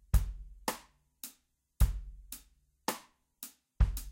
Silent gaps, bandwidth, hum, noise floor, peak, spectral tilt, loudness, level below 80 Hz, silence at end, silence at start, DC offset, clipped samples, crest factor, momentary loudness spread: none; 16.5 kHz; none; -70 dBFS; -12 dBFS; -4.5 dB/octave; -38 LUFS; -36 dBFS; 0 s; 0.15 s; under 0.1%; under 0.1%; 22 dB; 15 LU